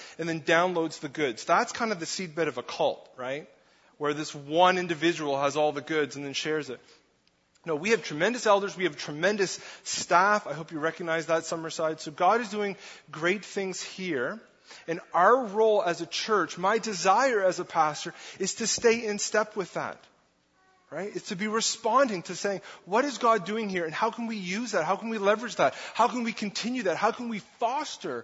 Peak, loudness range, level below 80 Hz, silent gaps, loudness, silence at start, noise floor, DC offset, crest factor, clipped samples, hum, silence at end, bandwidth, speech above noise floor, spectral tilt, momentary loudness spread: -8 dBFS; 4 LU; -76 dBFS; none; -28 LUFS; 0 s; -68 dBFS; under 0.1%; 22 dB; under 0.1%; none; 0 s; 8 kHz; 40 dB; -3.5 dB/octave; 12 LU